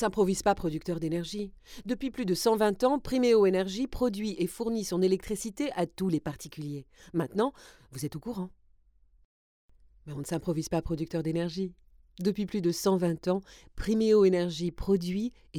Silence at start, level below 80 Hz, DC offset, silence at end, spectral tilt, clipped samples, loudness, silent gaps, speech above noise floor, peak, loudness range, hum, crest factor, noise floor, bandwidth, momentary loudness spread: 0 s; -50 dBFS; under 0.1%; 0 s; -6 dB/octave; under 0.1%; -30 LUFS; 9.25-9.69 s; 33 dB; -12 dBFS; 9 LU; none; 18 dB; -63 dBFS; 18.5 kHz; 14 LU